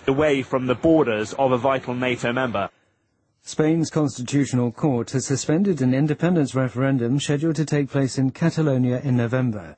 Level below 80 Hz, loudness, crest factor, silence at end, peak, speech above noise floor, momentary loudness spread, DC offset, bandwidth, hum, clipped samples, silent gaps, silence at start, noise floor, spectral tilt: -54 dBFS; -22 LUFS; 16 dB; 0.05 s; -6 dBFS; 48 dB; 4 LU; under 0.1%; 8.8 kHz; none; under 0.1%; none; 0 s; -68 dBFS; -6.5 dB/octave